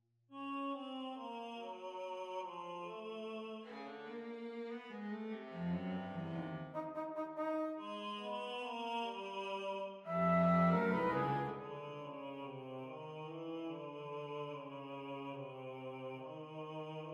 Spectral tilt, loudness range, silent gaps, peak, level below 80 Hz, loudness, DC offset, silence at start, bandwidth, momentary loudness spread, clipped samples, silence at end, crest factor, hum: -7.5 dB/octave; 10 LU; none; -22 dBFS; -76 dBFS; -42 LUFS; under 0.1%; 0.3 s; 6.8 kHz; 13 LU; under 0.1%; 0 s; 20 dB; none